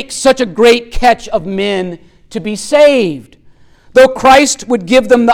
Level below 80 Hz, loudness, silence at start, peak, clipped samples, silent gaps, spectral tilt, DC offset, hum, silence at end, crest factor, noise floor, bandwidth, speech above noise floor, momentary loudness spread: -32 dBFS; -10 LUFS; 0 s; 0 dBFS; under 0.1%; none; -3.5 dB/octave; under 0.1%; none; 0 s; 10 dB; -42 dBFS; 17 kHz; 33 dB; 13 LU